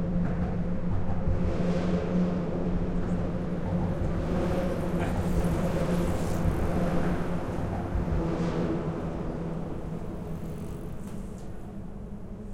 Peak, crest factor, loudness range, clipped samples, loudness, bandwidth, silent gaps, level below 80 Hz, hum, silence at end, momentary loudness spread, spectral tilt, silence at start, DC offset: -14 dBFS; 14 dB; 6 LU; under 0.1%; -30 LUFS; 14.5 kHz; none; -36 dBFS; none; 0 s; 11 LU; -8 dB/octave; 0 s; under 0.1%